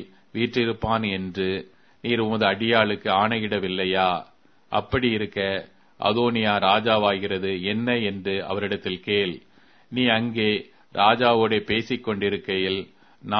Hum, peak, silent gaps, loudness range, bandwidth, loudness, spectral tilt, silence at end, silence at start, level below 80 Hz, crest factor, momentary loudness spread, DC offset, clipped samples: none; -2 dBFS; none; 2 LU; 6.4 kHz; -23 LUFS; -7 dB/octave; 0 s; 0 s; -54 dBFS; 22 dB; 9 LU; under 0.1%; under 0.1%